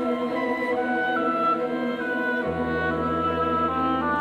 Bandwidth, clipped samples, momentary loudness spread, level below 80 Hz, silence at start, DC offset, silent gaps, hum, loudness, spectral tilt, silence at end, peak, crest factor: 13.5 kHz; under 0.1%; 3 LU; -48 dBFS; 0 s; under 0.1%; none; none; -24 LUFS; -7 dB/octave; 0 s; -12 dBFS; 12 dB